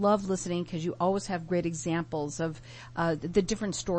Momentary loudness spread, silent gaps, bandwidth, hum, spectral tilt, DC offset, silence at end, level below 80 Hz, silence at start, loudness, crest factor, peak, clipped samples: 6 LU; none; 8.8 kHz; none; -5.5 dB/octave; under 0.1%; 0 s; -52 dBFS; 0 s; -31 LUFS; 18 dB; -12 dBFS; under 0.1%